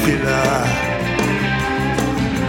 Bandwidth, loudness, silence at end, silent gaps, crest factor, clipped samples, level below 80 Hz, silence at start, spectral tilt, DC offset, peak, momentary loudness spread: 19 kHz; -18 LUFS; 0 s; none; 14 dB; under 0.1%; -34 dBFS; 0 s; -5 dB/octave; under 0.1%; -4 dBFS; 3 LU